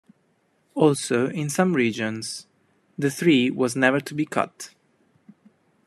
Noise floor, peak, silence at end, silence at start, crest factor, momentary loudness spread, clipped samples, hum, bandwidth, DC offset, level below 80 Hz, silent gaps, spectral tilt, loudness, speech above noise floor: -66 dBFS; -2 dBFS; 1.2 s; 0.75 s; 22 dB; 16 LU; under 0.1%; none; 14 kHz; under 0.1%; -70 dBFS; none; -5 dB/octave; -23 LUFS; 44 dB